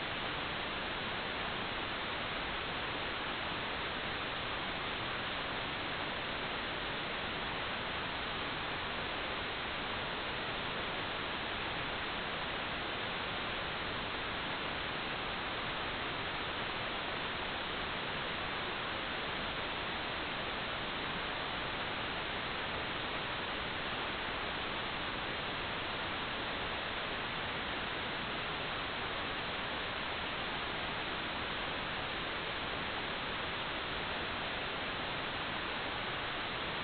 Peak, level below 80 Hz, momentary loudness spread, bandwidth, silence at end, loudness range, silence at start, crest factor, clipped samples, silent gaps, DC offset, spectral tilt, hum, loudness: -24 dBFS; -56 dBFS; 0 LU; 4.9 kHz; 0 s; 0 LU; 0 s; 14 dB; under 0.1%; none; under 0.1%; -1 dB/octave; none; -37 LUFS